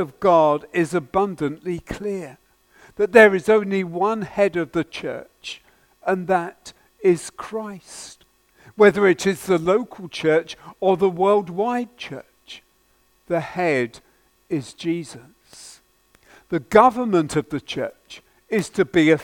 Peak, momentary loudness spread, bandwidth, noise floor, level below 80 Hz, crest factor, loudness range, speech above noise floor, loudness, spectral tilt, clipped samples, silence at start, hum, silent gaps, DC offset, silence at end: 0 dBFS; 20 LU; 16.5 kHz; -61 dBFS; -56 dBFS; 22 dB; 8 LU; 41 dB; -20 LUFS; -5.5 dB/octave; under 0.1%; 0 s; none; none; under 0.1%; 0 s